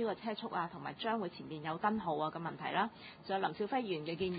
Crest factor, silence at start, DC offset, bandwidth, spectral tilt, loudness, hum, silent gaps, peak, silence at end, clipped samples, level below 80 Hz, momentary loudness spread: 18 dB; 0 s; under 0.1%; 4.9 kHz; -3.5 dB/octave; -38 LUFS; none; none; -20 dBFS; 0 s; under 0.1%; -70 dBFS; 6 LU